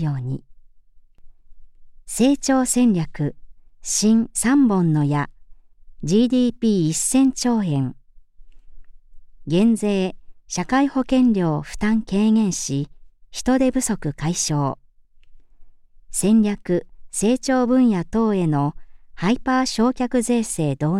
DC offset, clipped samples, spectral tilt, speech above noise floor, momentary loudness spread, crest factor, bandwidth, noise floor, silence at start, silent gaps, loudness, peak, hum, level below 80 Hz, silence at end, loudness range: under 0.1%; under 0.1%; -5.5 dB/octave; 29 dB; 11 LU; 16 dB; 14.5 kHz; -48 dBFS; 0 s; none; -20 LUFS; -6 dBFS; none; -44 dBFS; 0 s; 4 LU